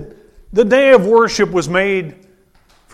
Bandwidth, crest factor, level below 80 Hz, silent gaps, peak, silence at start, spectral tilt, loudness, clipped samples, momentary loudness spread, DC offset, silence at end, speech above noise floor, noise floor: 12.5 kHz; 14 dB; -44 dBFS; none; 0 dBFS; 0 s; -5 dB/octave; -13 LUFS; under 0.1%; 11 LU; under 0.1%; 0.85 s; 40 dB; -52 dBFS